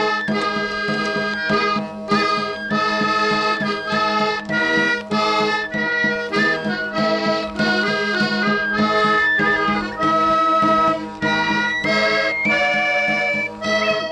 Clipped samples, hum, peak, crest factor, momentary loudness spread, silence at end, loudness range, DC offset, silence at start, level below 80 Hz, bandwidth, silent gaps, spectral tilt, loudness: under 0.1%; none; -6 dBFS; 12 dB; 5 LU; 0 s; 2 LU; under 0.1%; 0 s; -52 dBFS; 10.5 kHz; none; -4.5 dB/octave; -18 LUFS